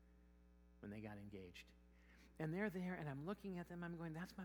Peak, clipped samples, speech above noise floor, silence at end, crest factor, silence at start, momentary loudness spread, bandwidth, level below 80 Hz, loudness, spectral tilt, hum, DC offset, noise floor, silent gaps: -30 dBFS; under 0.1%; 20 dB; 0 s; 20 dB; 0 s; 20 LU; over 20 kHz; -70 dBFS; -50 LUFS; -7.5 dB/octave; none; under 0.1%; -69 dBFS; none